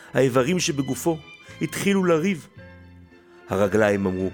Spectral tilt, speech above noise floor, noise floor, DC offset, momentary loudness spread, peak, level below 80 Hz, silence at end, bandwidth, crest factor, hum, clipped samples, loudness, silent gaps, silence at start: -5 dB/octave; 27 dB; -49 dBFS; under 0.1%; 11 LU; -6 dBFS; -56 dBFS; 0 s; 19 kHz; 18 dB; none; under 0.1%; -23 LUFS; none; 0 s